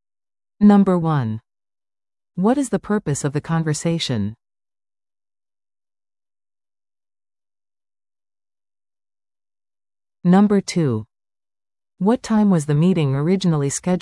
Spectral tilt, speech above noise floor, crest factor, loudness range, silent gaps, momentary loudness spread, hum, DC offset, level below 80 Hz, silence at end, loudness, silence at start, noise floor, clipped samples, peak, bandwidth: -6.5 dB/octave; over 73 dB; 18 dB; 7 LU; none; 9 LU; none; under 0.1%; -56 dBFS; 0 s; -19 LUFS; 0.6 s; under -90 dBFS; under 0.1%; -4 dBFS; 12 kHz